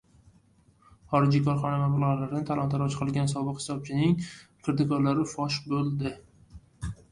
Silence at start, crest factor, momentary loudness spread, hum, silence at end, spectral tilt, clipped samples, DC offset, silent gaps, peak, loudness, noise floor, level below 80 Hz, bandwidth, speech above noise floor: 1.1 s; 20 dB; 11 LU; none; 0.2 s; -7 dB/octave; under 0.1%; under 0.1%; none; -8 dBFS; -28 LUFS; -62 dBFS; -54 dBFS; 11 kHz; 35 dB